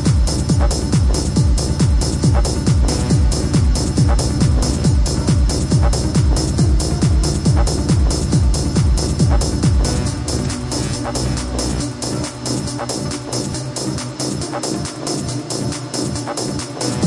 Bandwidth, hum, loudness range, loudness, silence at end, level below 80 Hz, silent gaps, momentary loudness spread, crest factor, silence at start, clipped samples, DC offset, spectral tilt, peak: 11.5 kHz; none; 6 LU; -18 LUFS; 0 s; -20 dBFS; none; 6 LU; 14 dB; 0 s; under 0.1%; under 0.1%; -5.5 dB/octave; -2 dBFS